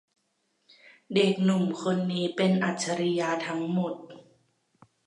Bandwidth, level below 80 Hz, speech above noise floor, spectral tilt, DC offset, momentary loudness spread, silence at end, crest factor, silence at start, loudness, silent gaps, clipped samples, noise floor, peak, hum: 11 kHz; -76 dBFS; 48 dB; -5.5 dB/octave; under 0.1%; 6 LU; 0.85 s; 18 dB; 1.1 s; -27 LUFS; none; under 0.1%; -74 dBFS; -10 dBFS; none